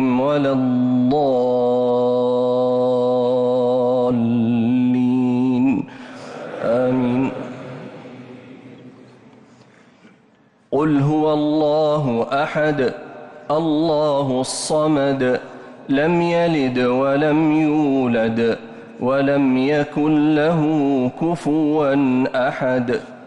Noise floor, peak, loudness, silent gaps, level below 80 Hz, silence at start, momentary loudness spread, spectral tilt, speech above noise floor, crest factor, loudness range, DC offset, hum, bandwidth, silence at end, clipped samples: -55 dBFS; -10 dBFS; -18 LUFS; none; -56 dBFS; 0 s; 12 LU; -6.5 dB/octave; 37 dB; 8 dB; 7 LU; under 0.1%; none; 11.5 kHz; 0 s; under 0.1%